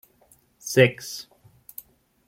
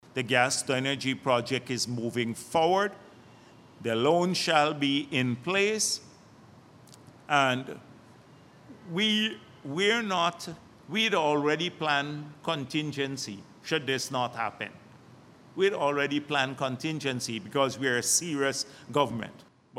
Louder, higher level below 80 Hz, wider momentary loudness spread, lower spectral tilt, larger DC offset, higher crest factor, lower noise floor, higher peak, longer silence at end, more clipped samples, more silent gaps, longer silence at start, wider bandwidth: first, -22 LUFS vs -28 LUFS; first, -64 dBFS vs -72 dBFS; first, 23 LU vs 12 LU; about the same, -4.5 dB/octave vs -3.5 dB/octave; neither; about the same, 24 dB vs 22 dB; first, -60 dBFS vs -54 dBFS; first, -4 dBFS vs -8 dBFS; first, 1.05 s vs 0 s; neither; neither; first, 0.65 s vs 0.15 s; about the same, 16.5 kHz vs 16 kHz